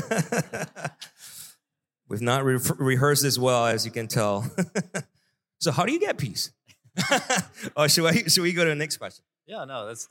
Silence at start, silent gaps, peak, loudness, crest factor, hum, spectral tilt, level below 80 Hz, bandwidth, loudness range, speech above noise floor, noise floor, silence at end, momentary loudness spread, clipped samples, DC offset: 0 s; none; -6 dBFS; -24 LUFS; 20 dB; none; -3.5 dB/octave; -66 dBFS; 17 kHz; 4 LU; 56 dB; -81 dBFS; 0.05 s; 17 LU; under 0.1%; under 0.1%